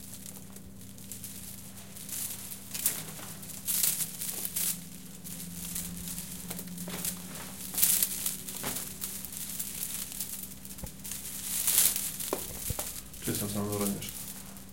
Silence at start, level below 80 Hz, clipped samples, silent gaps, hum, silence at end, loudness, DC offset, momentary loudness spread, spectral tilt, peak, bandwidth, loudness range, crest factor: 0 s; -56 dBFS; under 0.1%; none; none; 0 s; -32 LUFS; 0.3%; 17 LU; -2 dB/octave; -4 dBFS; 17 kHz; 6 LU; 32 dB